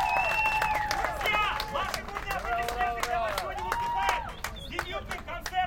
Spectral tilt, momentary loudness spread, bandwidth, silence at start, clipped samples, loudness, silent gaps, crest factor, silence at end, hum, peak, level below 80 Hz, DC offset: -3 dB/octave; 10 LU; 17 kHz; 0 s; under 0.1%; -29 LUFS; none; 20 dB; 0 s; none; -10 dBFS; -44 dBFS; under 0.1%